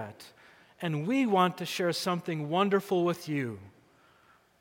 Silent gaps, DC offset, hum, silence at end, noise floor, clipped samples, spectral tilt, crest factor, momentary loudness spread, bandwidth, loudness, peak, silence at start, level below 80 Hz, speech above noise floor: none; under 0.1%; none; 0.9 s; -63 dBFS; under 0.1%; -5.5 dB/octave; 20 dB; 12 LU; 17 kHz; -29 LUFS; -12 dBFS; 0 s; -78 dBFS; 34 dB